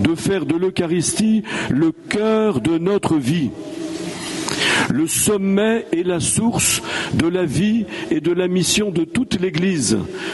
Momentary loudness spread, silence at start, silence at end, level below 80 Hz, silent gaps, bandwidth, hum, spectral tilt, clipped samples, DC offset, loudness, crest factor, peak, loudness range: 6 LU; 0 s; 0 s; -46 dBFS; none; 12 kHz; none; -4 dB/octave; under 0.1%; under 0.1%; -18 LUFS; 16 dB; -2 dBFS; 2 LU